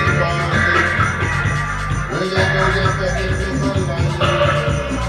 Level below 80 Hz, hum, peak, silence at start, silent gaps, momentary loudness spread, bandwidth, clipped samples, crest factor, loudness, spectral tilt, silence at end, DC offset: -28 dBFS; none; -4 dBFS; 0 s; none; 5 LU; 12 kHz; under 0.1%; 12 dB; -17 LUFS; -5.5 dB/octave; 0 s; under 0.1%